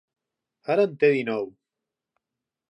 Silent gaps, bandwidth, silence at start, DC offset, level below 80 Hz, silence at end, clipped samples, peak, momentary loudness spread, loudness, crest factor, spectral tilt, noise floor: none; 8 kHz; 0.7 s; under 0.1%; -80 dBFS; 1.25 s; under 0.1%; -8 dBFS; 16 LU; -23 LUFS; 20 dB; -7.5 dB/octave; -87 dBFS